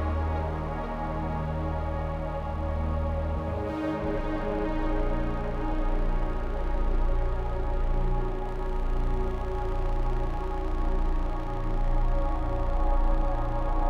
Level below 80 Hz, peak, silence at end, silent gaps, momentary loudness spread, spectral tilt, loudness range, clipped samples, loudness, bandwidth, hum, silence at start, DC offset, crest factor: -28 dBFS; -14 dBFS; 0 s; none; 3 LU; -8.5 dB/octave; 2 LU; under 0.1%; -31 LUFS; 4.8 kHz; none; 0 s; under 0.1%; 12 dB